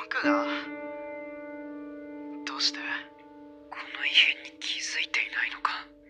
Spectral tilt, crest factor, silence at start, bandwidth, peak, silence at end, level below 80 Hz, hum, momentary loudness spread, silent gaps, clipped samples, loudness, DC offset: -0.5 dB/octave; 26 dB; 0 s; 10 kHz; -6 dBFS; 0 s; -72 dBFS; none; 19 LU; none; under 0.1%; -27 LUFS; under 0.1%